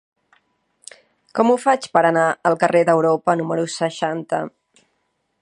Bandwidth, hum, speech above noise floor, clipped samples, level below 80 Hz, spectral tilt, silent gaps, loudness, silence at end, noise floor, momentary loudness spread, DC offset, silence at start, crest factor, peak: 11.5 kHz; none; 52 dB; under 0.1%; -72 dBFS; -5.5 dB/octave; none; -18 LUFS; 0.95 s; -70 dBFS; 9 LU; under 0.1%; 1.35 s; 20 dB; 0 dBFS